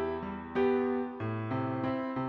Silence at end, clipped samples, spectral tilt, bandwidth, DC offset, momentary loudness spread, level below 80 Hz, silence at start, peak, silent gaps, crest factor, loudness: 0 s; under 0.1%; -9.5 dB/octave; 5.6 kHz; under 0.1%; 7 LU; -60 dBFS; 0 s; -18 dBFS; none; 14 dB; -33 LUFS